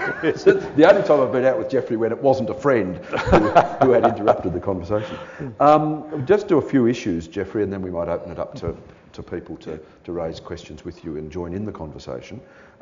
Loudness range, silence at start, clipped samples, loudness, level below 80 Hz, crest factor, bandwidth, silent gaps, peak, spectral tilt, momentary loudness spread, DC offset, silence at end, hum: 14 LU; 0 s; under 0.1%; -19 LUFS; -44 dBFS; 18 dB; 7.4 kHz; none; -2 dBFS; -5.5 dB/octave; 19 LU; under 0.1%; 0.4 s; none